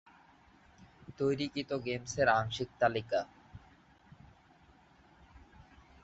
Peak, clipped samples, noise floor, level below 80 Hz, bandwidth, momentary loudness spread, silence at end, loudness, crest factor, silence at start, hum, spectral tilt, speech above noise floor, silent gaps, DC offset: -14 dBFS; under 0.1%; -63 dBFS; -62 dBFS; 8 kHz; 27 LU; 0.4 s; -33 LUFS; 22 dB; 0.8 s; none; -3.5 dB/octave; 30 dB; none; under 0.1%